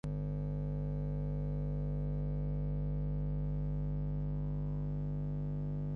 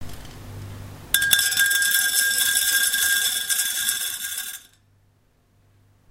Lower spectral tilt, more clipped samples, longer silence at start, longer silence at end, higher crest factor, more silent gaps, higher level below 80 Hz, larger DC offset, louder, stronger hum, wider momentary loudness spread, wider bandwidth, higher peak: first, -11.5 dB/octave vs 1.5 dB/octave; neither; about the same, 0.05 s vs 0 s; second, 0 s vs 1.5 s; second, 8 dB vs 24 dB; neither; first, -42 dBFS vs -52 dBFS; neither; second, -38 LUFS vs -19 LUFS; first, 50 Hz at -35 dBFS vs none; second, 1 LU vs 22 LU; second, 3.1 kHz vs 16.5 kHz; second, -28 dBFS vs 0 dBFS